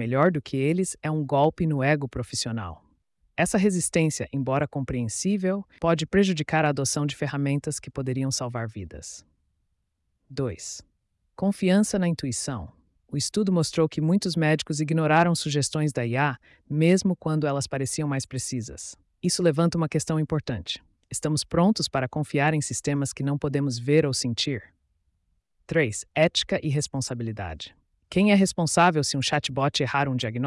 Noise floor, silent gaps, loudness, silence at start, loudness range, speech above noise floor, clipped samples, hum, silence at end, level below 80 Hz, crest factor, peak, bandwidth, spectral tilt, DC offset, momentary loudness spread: -75 dBFS; none; -25 LUFS; 0 s; 4 LU; 51 dB; under 0.1%; none; 0 s; -54 dBFS; 16 dB; -8 dBFS; 12 kHz; -5 dB/octave; under 0.1%; 12 LU